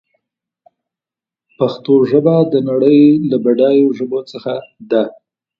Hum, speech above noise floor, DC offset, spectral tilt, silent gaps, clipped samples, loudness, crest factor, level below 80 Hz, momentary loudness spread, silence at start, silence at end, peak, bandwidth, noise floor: none; 76 dB; under 0.1%; -9.5 dB/octave; none; under 0.1%; -13 LUFS; 14 dB; -60 dBFS; 14 LU; 1.6 s; 0.5 s; 0 dBFS; 5.8 kHz; -88 dBFS